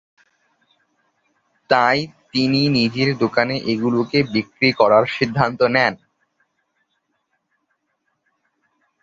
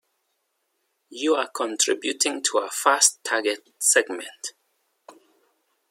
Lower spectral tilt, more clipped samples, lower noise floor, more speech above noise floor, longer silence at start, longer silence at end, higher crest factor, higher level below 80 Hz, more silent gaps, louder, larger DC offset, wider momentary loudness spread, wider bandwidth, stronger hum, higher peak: first, -6.5 dB/octave vs 1.5 dB/octave; neither; about the same, -72 dBFS vs -74 dBFS; about the same, 54 dB vs 51 dB; first, 1.7 s vs 1.1 s; first, 3.1 s vs 0.8 s; second, 20 dB vs 26 dB; first, -58 dBFS vs -86 dBFS; neither; first, -18 LUFS vs -22 LUFS; neither; second, 6 LU vs 15 LU; second, 7.8 kHz vs 16.5 kHz; neither; about the same, -2 dBFS vs 0 dBFS